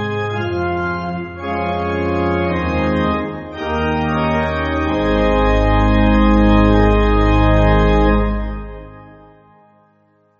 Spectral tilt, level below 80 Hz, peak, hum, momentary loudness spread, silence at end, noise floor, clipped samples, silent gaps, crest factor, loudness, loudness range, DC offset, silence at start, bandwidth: -6 dB/octave; -22 dBFS; -2 dBFS; none; 11 LU; 1.3 s; -56 dBFS; under 0.1%; none; 14 dB; -16 LUFS; 6 LU; under 0.1%; 0 s; 7 kHz